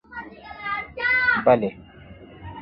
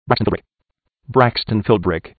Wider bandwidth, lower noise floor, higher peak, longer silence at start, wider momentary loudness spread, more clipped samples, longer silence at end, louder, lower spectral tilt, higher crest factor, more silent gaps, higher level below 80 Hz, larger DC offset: first, 5.6 kHz vs 4.8 kHz; second, -44 dBFS vs -74 dBFS; second, -4 dBFS vs 0 dBFS; about the same, 0.1 s vs 0.05 s; first, 22 LU vs 6 LU; neither; about the same, 0 s vs 0.1 s; second, -21 LUFS vs -18 LUFS; about the same, -8.5 dB/octave vs -9.5 dB/octave; about the same, 20 dB vs 18 dB; neither; second, -52 dBFS vs -40 dBFS; neither